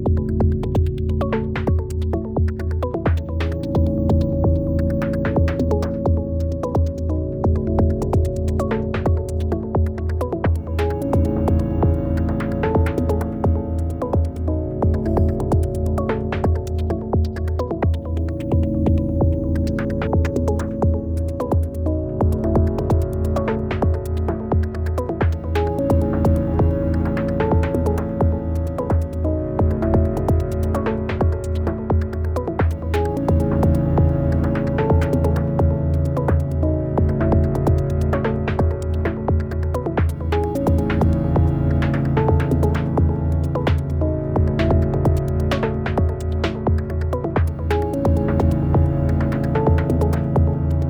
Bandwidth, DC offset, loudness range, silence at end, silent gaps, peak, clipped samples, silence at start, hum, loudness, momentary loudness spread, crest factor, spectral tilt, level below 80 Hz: 9 kHz; under 0.1%; 2 LU; 0 s; none; -6 dBFS; under 0.1%; 0 s; none; -20 LUFS; 5 LU; 14 dB; -9 dB/octave; -26 dBFS